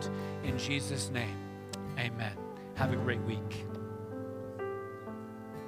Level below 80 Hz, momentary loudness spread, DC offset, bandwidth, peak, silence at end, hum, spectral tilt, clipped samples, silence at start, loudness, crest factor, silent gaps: -62 dBFS; 10 LU; under 0.1%; 15.5 kHz; -16 dBFS; 0 s; none; -5 dB/octave; under 0.1%; 0 s; -37 LUFS; 20 dB; none